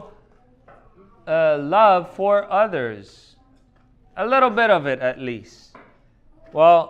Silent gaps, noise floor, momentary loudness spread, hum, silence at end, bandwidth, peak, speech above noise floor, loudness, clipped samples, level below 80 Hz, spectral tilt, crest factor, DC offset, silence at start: none; -55 dBFS; 17 LU; none; 0 s; 7.6 kHz; -2 dBFS; 37 dB; -19 LUFS; under 0.1%; -56 dBFS; -6.5 dB/octave; 18 dB; under 0.1%; 0 s